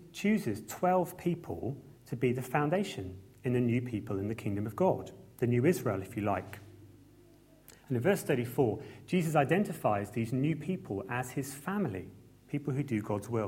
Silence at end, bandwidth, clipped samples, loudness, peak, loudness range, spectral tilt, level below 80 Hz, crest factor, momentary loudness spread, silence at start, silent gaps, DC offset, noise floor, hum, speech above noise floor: 0 s; 16.5 kHz; under 0.1%; -33 LUFS; -14 dBFS; 3 LU; -7 dB/octave; -64 dBFS; 20 dB; 10 LU; 0 s; none; under 0.1%; -59 dBFS; none; 28 dB